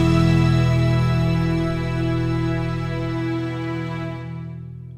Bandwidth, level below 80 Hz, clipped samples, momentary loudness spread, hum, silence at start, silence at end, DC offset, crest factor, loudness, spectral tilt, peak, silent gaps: 10 kHz; -34 dBFS; under 0.1%; 14 LU; none; 0 s; 0 s; under 0.1%; 14 dB; -21 LUFS; -7.5 dB/octave; -6 dBFS; none